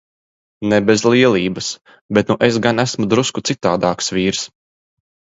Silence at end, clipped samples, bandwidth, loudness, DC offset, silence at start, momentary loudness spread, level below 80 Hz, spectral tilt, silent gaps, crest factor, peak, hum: 0.9 s; under 0.1%; 8 kHz; -16 LUFS; under 0.1%; 0.6 s; 11 LU; -50 dBFS; -4.5 dB/octave; 2.01-2.09 s; 18 dB; 0 dBFS; none